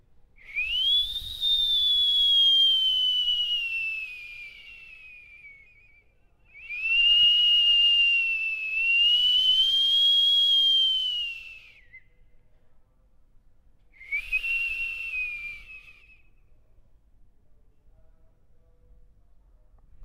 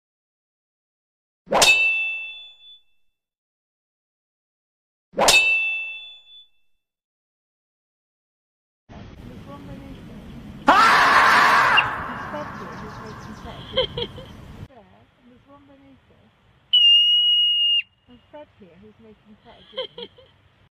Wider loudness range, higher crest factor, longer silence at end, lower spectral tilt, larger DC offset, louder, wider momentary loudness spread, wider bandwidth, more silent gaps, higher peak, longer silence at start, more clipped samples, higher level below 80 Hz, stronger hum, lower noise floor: about the same, 16 LU vs 14 LU; second, 14 dB vs 22 dB; second, 0 s vs 0.65 s; second, 2 dB/octave vs -1 dB/octave; neither; second, -20 LUFS vs -16 LUFS; second, 17 LU vs 26 LU; about the same, 16 kHz vs 15.5 kHz; second, none vs 3.38-5.12 s, 7.04-8.87 s; second, -14 dBFS vs -2 dBFS; second, 0.5 s vs 1.5 s; neither; about the same, -54 dBFS vs -52 dBFS; neither; second, -60 dBFS vs -66 dBFS